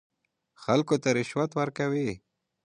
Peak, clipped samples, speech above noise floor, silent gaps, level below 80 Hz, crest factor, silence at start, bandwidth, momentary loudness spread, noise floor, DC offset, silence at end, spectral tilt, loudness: -8 dBFS; under 0.1%; 40 dB; none; -64 dBFS; 20 dB; 0.6 s; 11 kHz; 10 LU; -66 dBFS; under 0.1%; 0.5 s; -6 dB/octave; -28 LUFS